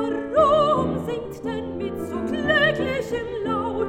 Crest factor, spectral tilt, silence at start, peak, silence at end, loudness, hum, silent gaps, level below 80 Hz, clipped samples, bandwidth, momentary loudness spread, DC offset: 16 dB; -6 dB/octave; 0 s; -6 dBFS; 0 s; -23 LUFS; none; none; -48 dBFS; under 0.1%; 16 kHz; 12 LU; under 0.1%